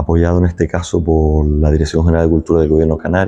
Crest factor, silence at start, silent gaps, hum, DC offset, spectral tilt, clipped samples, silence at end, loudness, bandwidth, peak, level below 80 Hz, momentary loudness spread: 12 dB; 0 s; none; none; under 0.1%; -8 dB/octave; under 0.1%; 0 s; -14 LUFS; 9 kHz; 0 dBFS; -20 dBFS; 3 LU